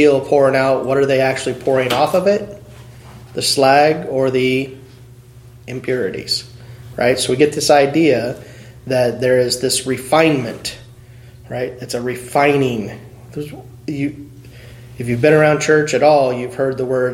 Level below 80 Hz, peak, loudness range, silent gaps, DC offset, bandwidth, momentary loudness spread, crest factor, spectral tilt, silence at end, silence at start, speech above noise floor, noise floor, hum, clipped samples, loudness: -50 dBFS; 0 dBFS; 6 LU; none; under 0.1%; 16.5 kHz; 17 LU; 16 dB; -4.5 dB/octave; 0 s; 0 s; 25 dB; -41 dBFS; none; under 0.1%; -16 LUFS